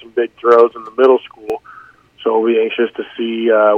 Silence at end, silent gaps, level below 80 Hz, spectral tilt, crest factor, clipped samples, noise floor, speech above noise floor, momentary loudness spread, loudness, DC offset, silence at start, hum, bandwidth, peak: 0 s; none; -62 dBFS; -6 dB/octave; 14 dB; under 0.1%; -42 dBFS; 28 dB; 15 LU; -15 LUFS; under 0.1%; 0.15 s; none; 5.6 kHz; 0 dBFS